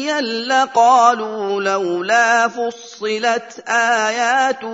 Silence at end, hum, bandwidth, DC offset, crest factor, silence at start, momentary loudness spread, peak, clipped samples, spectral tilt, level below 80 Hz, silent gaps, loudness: 0 s; none; 8 kHz; under 0.1%; 16 dB; 0 s; 10 LU; 0 dBFS; under 0.1%; -2 dB/octave; -74 dBFS; none; -16 LUFS